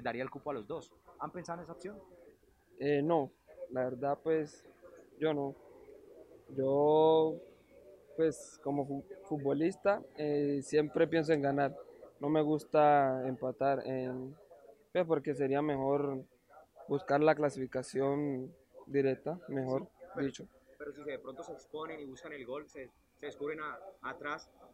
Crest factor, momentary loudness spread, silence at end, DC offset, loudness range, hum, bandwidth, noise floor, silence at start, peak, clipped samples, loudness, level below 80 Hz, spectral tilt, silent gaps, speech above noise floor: 20 dB; 17 LU; 0.1 s; under 0.1%; 10 LU; none; 11.5 kHz; -64 dBFS; 0 s; -14 dBFS; under 0.1%; -34 LUFS; -72 dBFS; -7 dB/octave; none; 30 dB